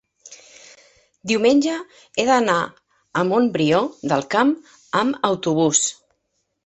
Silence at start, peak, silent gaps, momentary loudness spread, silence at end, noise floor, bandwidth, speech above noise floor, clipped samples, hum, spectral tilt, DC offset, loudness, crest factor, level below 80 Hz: 0.25 s; -2 dBFS; none; 11 LU; 0.75 s; -72 dBFS; 8.4 kHz; 53 dB; under 0.1%; none; -4 dB/octave; under 0.1%; -20 LUFS; 18 dB; -62 dBFS